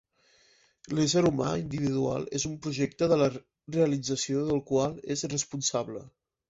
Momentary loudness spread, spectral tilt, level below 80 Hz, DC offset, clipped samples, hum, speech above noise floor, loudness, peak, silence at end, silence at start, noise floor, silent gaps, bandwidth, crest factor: 9 LU; -5 dB/octave; -60 dBFS; under 0.1%; under 0.1%; none; 36 dB; -29 LUFS; -12 dBFS; 0.4 s; 0.85 s; -64 dBFS; none; 8 kHz; 18 dB